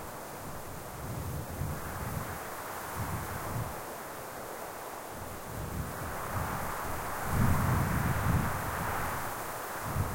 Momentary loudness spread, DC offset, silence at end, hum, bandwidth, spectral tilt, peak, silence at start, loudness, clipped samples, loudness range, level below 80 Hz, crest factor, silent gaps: 12 LU; under 0.1%; 0 s; none; 16.5 kHz; -5.5 dB/octave; -14 dBFS; 0 s; -35 LUFS; under 0.1%; 7 LU; -46 dBFS; 20 dB; none